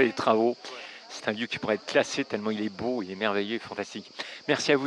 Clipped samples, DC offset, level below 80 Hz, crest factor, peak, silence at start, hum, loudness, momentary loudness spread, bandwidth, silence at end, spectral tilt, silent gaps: under 0.1%; under 0.1%; -70 dBFS; 22 dB; -6 dBFS; 0 s; none; -29 LUFS; 13 LU; 11.5 kHz; 0 s; -4 dB/octave; none